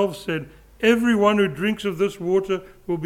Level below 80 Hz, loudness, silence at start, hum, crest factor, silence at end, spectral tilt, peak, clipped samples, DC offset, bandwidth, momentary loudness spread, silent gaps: -52 dBFS; -22 LUFS; 0 s; none; 16 dB; 0 s; -6 dB/octave; -4 dBFS; under 0.1%; under 0.1%; 16 kHz; 11 LU; none